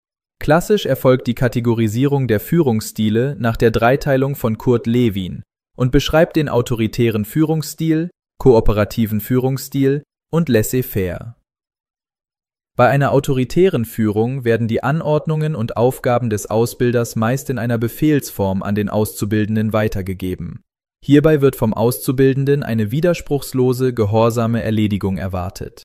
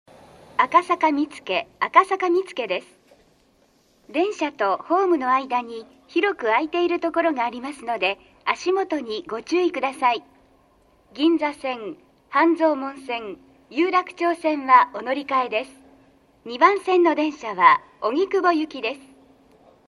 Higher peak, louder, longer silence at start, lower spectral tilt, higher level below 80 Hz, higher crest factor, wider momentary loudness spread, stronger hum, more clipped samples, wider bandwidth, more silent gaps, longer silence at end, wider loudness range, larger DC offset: about the same, 0 dBFS vs 0 dBFS; first, -17 LUFS vs -22 LUFS; second, 0.4 s vs 0.6 s; first, -6.5 dB/octave vs -4 dB/octave; first, -34 dBFS vs -68 dBFS; second, 16 dB vs 22 dB; second, 7 LU vs 12 LU; neither; neither; first, 15.5 kHz vs 11.5 kHz; first, 11.80-11.84 s vs none; second, 0.05 s vs 0.9 s; about the same, 3 LU vs 4 LU; neither